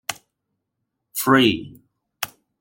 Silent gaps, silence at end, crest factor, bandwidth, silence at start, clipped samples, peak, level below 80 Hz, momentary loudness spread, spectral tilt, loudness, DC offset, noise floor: none; 0.35 s; 22 dB; 17 kHz; 0.1 s; under 0.1%; -2 dBFS; -60 dBFS; 16 LU; -4 dB/octave; -21 LUFS; under 0.1%; -79 dBFS